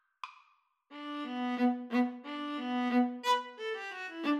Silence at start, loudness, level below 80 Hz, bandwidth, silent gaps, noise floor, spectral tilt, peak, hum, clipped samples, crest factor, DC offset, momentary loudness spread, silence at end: 0.25 s; -34 LUFS; under -90 dBFS; 13.5 kHz; none; -70 dBFS; -3.5 dB/octave; -18 dBFS; none; under 0.1%; 16 dB; under 0.1%; 17 LU; 0 s